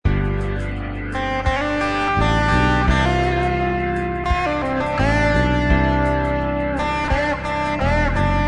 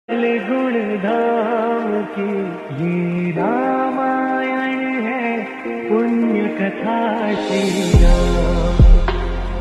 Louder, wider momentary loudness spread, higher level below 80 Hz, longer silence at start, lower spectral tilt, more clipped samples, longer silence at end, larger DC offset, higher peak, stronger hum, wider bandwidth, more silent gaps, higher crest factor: about the same, -19 LUFS vs -18 LUFS; about the same, 6 LU vs 8 LU; second, -26 dBFS vs -20 dBFS; about the same, 0.05 s vs 0.1 s; about the same, -6.5 dB/octave vs -7 dB/octave; neither; about the same, 0 s vs 0 s; neither; second, -4 dBFS vs 0 dBFS; neither; about the same, 10.5 kHz vs 11 kHz; neither; about the same, 16 dB vs 16 dB